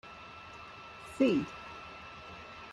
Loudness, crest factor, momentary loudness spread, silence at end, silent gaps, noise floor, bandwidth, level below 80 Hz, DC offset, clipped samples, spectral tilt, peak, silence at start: -33 LUFS; 22 dB; 18 LU; 0 s; none; -49 dBFS; 12 kHz; -64 dBFS; under 0.1%; under 0.1%; -6 dB/octave; -16 dBFS; 0.05 s